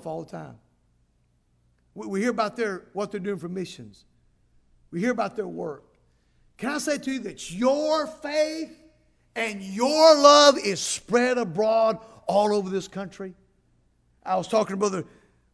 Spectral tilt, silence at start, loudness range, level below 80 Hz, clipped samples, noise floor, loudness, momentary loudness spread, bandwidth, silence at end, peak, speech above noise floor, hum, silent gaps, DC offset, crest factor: -3.5 dB/octave; 0.05 s; 12 LU; -64 dBFS; under 0.1%; -67 dBFS; -23 LUFS; 20 LU; 11 kHz; 0.5 s; -2 dBFS; 43 dB; 60 Hz at -60 dBFS; none; under 0.1%; 22 dB